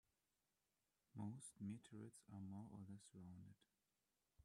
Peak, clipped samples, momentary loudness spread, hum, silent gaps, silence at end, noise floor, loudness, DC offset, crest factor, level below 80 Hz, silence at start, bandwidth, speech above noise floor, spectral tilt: -40 dBFS; under 0.1%; 8 LU; none; none; 0 s; under -90 dBFS; -58 LUFS; under 0.1%; 18 dB; -88 dBFS; 1.15 s; 12 kHz; over 32 dB; -6.5 dB/octave